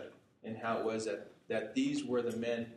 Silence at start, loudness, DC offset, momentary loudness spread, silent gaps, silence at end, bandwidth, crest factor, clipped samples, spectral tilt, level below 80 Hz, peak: 0 s; -37 LUFS; under 0.1%; 12 LU; none; 0 s; 12.5 kHz; 14 dB; under 0.1%; -5 dB/octave; -78 dBFS; -24 dBFS